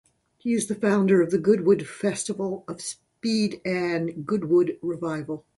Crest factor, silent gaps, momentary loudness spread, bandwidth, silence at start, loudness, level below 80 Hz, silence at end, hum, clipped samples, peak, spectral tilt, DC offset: 16 dB; none; 12 LU; 11.5 kHz; 0.45 s; -25 LUFS; -66 dBFS; 0.2 s; none; under 0.1%; -8 dBFS; -5.5 dB/octave; under 0.1%